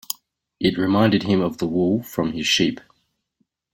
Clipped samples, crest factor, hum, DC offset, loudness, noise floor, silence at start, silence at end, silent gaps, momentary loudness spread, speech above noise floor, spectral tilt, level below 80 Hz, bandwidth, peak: under 0.1%; 20 dB; none; under 0.1%; -20 LUFS; -71 dBFS; 0.1 s; 0.95 s; none; 10 LU; 51 dB; -5 dB/octave; -54 dBFS; 17 kHz; -2 dBFS